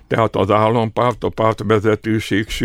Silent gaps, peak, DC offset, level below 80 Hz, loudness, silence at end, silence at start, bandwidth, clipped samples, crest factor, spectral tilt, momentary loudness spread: none; 0 dBFS; under 0.1%; -40 dBFS; -17 LUFS; 0 s; 0.1 s; 15.5 kHz; under 0.1%; 16 dB; -6.5 dB/octave; 4 LU